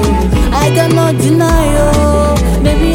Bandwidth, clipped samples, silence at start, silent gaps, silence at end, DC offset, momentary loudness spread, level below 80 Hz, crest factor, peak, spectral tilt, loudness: 17 kHz; under 0.1%; 0 s; none; 0 s; under 0.1%; 2 LU; -14 dBFS; 10 dB; 0 dBFS; -6 dB/octave; -11 LUFS